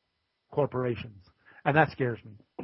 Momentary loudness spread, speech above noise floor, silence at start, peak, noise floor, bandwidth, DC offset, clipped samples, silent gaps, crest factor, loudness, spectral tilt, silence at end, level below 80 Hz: 18 LU; 50 dB; 0.5 s; -6 dBFS; -78 dBFS; 5.8 kHz; under 0.1%; under 0.1%; none; 26 dB; -29 LUFS; -11 dB/octave; 0 s; -64 dBFS